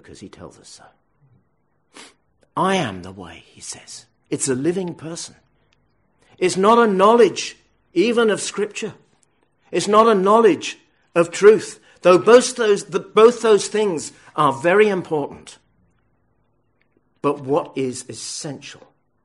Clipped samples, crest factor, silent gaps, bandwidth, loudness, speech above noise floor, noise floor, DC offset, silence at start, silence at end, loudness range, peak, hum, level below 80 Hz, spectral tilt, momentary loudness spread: under 0.1%; 18 dB; none; 11.5 kHz; -17 LUFS; 50 dB; -67 dBFS; under 0.1%; 0.1 s; 0.5 s; 12 LU; 0 dBFS; none; -64 dBFS; -4.5 dB/octave; 21 LU